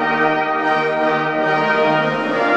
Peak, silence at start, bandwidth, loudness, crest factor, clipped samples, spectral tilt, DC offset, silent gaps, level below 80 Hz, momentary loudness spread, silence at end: -4 dBFS; 0 s; 8.8 kHz; -17 LUFS; 14 dB; under 0.1%; -6 dB/octave; under 0.1%; none; -66 dBFS; 2 LU; 0 s